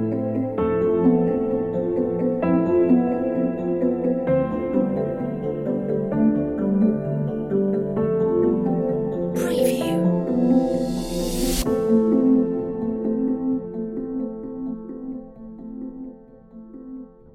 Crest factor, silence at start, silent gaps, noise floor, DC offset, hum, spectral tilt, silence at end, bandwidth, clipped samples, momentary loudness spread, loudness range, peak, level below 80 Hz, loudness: 16 dB; 0 s; none; -44 dBFS; under 0.1%; none; -7 dB/octave; 0.25 s; 16.5 kHz; under 0.1%; 15 LU; 7 LU; -6 dBFS; -42 dBFS; -22 LUFS